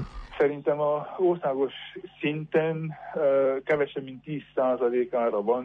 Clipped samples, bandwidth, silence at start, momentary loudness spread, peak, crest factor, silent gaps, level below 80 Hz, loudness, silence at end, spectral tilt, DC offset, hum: under 0.1%; 5.8 kHz; 0 s; 11 LU; -12 dBFS; 14 dB; none; -54 dBFS; -27 LUFS; 0 s; -8.5 dB/octave; under 0.1%; none